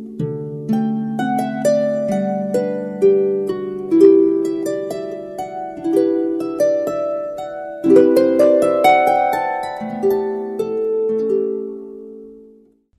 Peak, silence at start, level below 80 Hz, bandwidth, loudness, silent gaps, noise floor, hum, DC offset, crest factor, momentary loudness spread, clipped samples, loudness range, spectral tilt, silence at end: 0 dBFS; 0 s; -58 dBFS; 13.5 kHz; -17 LUFS; none; -50 dBFS; none; under 0.1%; 16 dB; 14 LU; under 0.1%; 6 LU; -7 dB/octave; 0.55 s